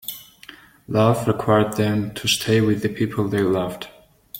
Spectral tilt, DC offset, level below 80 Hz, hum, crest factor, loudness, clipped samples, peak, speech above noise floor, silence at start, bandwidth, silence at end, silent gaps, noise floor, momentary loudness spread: -5.5 dB/octave; under 0.1%; -52 dBFS; none; 20 dB; -20 LUFS; under 0.1%; -2 dBFS; 26 dB; 0.05 s; 17 kHz; 0 s; none; -45 dBFS; 13 LU